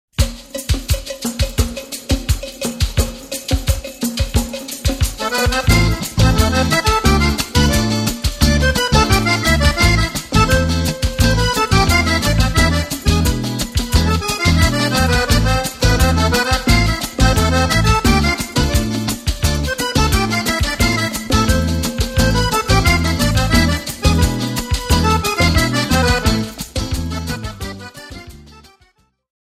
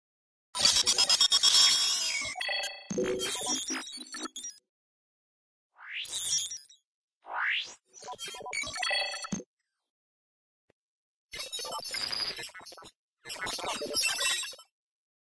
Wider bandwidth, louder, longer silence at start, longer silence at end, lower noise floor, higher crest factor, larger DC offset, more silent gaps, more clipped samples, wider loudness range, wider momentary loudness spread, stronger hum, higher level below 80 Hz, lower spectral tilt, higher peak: first, 16 kHz vs 11 kHz; first, -16 LUFS vs -27 LUFS; second, 0.2 s vs 0.55 s; first, 1.05 s vs 0.7 s; second, -56 dBFS vs under -90 dBFS; second, 16 dB vs 24 dB; neither; second, none vs 4.69-5.70 s, 6.85-7.08 s, 7.15-7.21 s, 9.46-9.57 s, 9.90-11.29 s, 12.96-13.17 s; neither; second, 6 LU vs 13 LU; second, 8 LU vs 19 LU; neither; first, -22 dBFS vs -66 dBFS; first, -4.5 dB/octave vs 0.5 dB/octave; first, 0 dBFS vs -10 dBFS